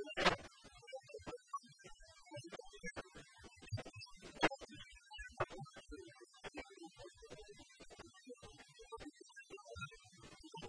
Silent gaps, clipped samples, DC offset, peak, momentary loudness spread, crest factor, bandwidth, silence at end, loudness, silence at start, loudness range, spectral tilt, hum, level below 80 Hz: none; under 0.1%; under 0.1%; -18 dBFS; 20 LU; 30 dB; 10.5 kHz; 0 s; -47 LUFS; 0 s; 10 LU; -4 dB/octave; none; -64 dBFS